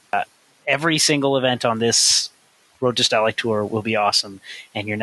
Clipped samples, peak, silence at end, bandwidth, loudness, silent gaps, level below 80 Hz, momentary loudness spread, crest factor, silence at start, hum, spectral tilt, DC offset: under 0.1%; -2 dBFS; 0 s; 12.5 kHz; -18 LUFS; none; -62 dBFS; 15 LU; 18 dB; 0.15 s; none; -2.5 dB/octave; under 0.1%